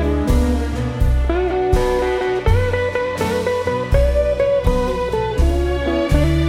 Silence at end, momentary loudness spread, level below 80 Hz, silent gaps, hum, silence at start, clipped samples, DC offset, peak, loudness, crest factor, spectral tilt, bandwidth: 0 s; 3 LU; -20 dBFS; none; none; 0 s; under 0.1%; under 0.1%; -2 dBFS; -18 LUFS; 14 dB; -7 dB/octave; 15 kHz